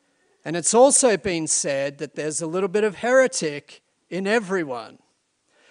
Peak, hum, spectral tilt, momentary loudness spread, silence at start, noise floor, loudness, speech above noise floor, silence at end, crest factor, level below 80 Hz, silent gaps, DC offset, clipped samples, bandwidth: -4 dBFS; none; -3 dB/octave; 16 LU; 0.45 s; -68 dBFS; -21 LUFS; 47 dB; 0.8 s; 18 dB; -64 dBFS; none; under 0.1%; under 0.1%; 11 kHz